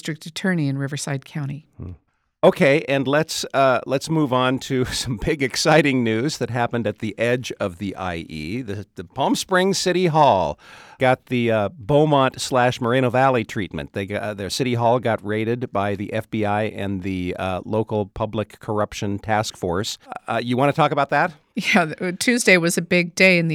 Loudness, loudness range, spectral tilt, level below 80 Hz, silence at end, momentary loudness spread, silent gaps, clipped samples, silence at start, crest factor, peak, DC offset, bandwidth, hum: -21 LUFS; 6 LU; -5 dB/octave; -50 dBFS; 0 s; 12 LU; none; under 0.1%; 0.05 s; 20 dB; 0 dBFS; under 0.1%; 18.5 kHz; none